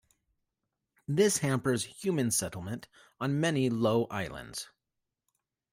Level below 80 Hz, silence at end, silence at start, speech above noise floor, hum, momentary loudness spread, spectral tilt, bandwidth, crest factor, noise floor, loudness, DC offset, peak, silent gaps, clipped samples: -64 dBFS; 1.05 s; 1.1 s; 56 dB; none; 14 LU; -4.5 dB/octave; 16 kHz; 18 dB; -86 dBFS; -30 LUFS; under 0.1%; -14 dBFS; none; under 0.1%